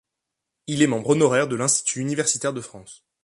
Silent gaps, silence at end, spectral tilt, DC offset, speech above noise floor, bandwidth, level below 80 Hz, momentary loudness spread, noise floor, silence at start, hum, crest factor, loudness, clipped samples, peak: none; 0.3 s; -4 dB/octave; under 0.1%; 61 dB; 11.5 kHz; -64 dBFS; 14 LU; -83 dBFS; 0.7 s; none; 18 dB; -21 LUFS; under 0.1%; -4 dBFS